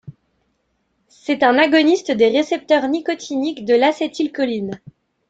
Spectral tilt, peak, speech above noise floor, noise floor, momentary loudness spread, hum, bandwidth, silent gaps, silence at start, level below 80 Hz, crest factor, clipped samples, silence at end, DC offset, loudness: -4.5 dB/octave; -2 dBFS; 51 dB; -68 dBFS; 11 LU; none; 8 kHz; none; 0.05 s; -64 dBFS; 18 dB; under 0.1%; 0.55 s; under 0.1%; -17 LUFS